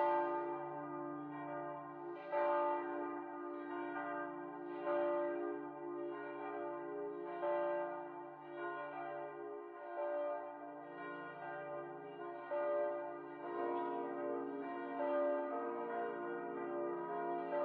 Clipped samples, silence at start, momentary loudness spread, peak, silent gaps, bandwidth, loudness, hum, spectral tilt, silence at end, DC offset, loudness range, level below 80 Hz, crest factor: under 0.1%; 0 s; 11 LU; -26 dBFS; none; 4.6 kHz; -42 LUFS; none; -4.5 dB/octave; 0 s; under 0.1%; 5 LU; under -90 dBFS; 16 dB